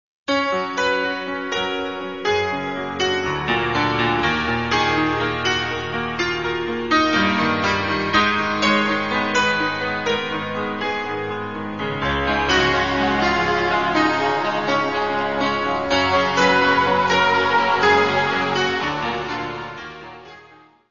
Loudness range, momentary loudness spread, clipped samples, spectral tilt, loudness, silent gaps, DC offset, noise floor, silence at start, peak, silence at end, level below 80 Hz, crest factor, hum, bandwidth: 5 LU; 9 LU; under 0.1%; -4.5 dB/octave; -20 LUFS; none; 0.5%; -49 dBFS; 0.3 s; -4 dBFS; 0.25 s; -44 dBFS; 16 dB; none; 7.4 kHz